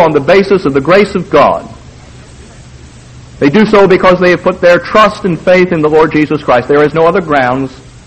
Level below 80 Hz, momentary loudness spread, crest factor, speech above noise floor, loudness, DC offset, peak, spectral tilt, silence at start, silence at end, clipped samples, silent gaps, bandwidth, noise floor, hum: -36 dBFS; 5 LU; 8 dB; 25 dB; -8 LUFS; 0.4%; 0 dBFS; -6.5 dB/octave; 0 s; 0.2 s; 1%; none; 9.2 kHz; -33 dBFS; none